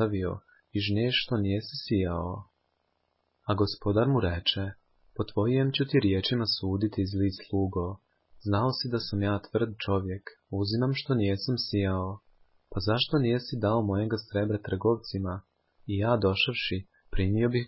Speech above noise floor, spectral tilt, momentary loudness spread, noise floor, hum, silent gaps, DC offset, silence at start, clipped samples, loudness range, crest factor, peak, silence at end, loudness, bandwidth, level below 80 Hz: 48 dB; -10 dB/octave; 12 LU; -75 dBFS; none; none; under 0.1%; 0 s; under 0.1%; 3 LU; 18 dB; -10 dBFS; 0 s; -29 LUFS; 5.8 kHz; -46 dBFS